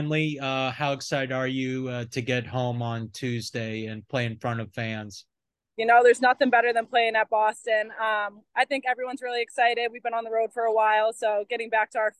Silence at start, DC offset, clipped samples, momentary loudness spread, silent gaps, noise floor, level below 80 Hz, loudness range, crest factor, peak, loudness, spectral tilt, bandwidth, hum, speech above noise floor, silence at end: 0 s; under 0.1%; under 0.1%; 11 LU; none; -68 dBFS; -66 dBFS; 8 LU; 18 dB; -8 dBFS; -25 LUFS; -5 dB/octave; 12.5 kHz; none; 43 dB; 0.1 s